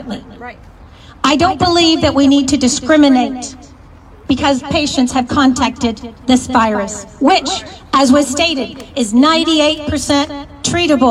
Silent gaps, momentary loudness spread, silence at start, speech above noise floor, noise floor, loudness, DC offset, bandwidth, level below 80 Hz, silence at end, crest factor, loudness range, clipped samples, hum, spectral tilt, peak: none; 12 LU; 0 s; 26 dB; -39 dBFS; -13 LUFS; under 0.1%; 13 kHz; -40 dBFS; 0 s; 14 dB; 2 LU; under 0.1%; none; -3.5 dB/octave; 0 dBFS